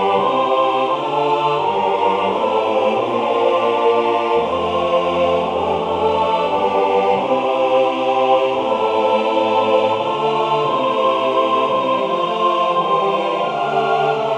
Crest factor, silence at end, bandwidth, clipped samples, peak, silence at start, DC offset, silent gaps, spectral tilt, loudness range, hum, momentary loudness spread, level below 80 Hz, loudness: 14 dB; 0 s; 9.6 kHz; under 0.1%; -2 dBFS; 0 s; under 0.1%; none; -5.5 dB/octave; 1 LU; none; 3 LU; -58 dBFS; -17 LUFS